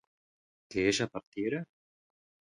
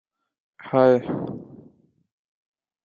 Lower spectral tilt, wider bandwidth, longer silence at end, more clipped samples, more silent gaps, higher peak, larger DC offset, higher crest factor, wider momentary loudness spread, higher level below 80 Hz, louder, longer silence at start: second, -4 dB/octave vs -9 dB/octave; first, 11.5 kHz vs 6.8 kHz; second, 0.9 s vs 1.3 s; neither; first, 1.27-1.32 s vs none; second, -14 dBFS vs -4 dBFS; neither; about the same, 22 dB vs 22 dB; second, 10 LU vs 17 LU; about the same, -64 dBFS vs -64 dBFS; second, -33 LUFS vs -21 LUFS; about the same, 0.7 s vs 0.6 s